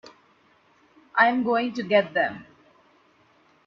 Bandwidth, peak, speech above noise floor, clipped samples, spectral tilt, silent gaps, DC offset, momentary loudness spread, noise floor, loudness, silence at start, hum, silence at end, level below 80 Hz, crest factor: 7 kHz; -4 dBFS; 38 dB; under 0.1%; -6 dB/octave; none; under 0.1%; 9 LU; -61 dBFS; -23 LUFS; 1.15 s; none; 1.25 s; -72 dBFS; 22 dB